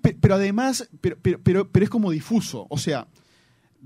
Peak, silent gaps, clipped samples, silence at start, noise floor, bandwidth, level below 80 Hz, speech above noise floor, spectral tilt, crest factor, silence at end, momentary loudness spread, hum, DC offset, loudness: -4 dBFS; none; under 0.1%; 0.05 s; -60 dBFS; 16 kHz; -46 dBFS; 38 dB; -6.5 dB/octave; 18 dB; 0.85 s; 9 LU; none; under 0.1%; -22 LUFS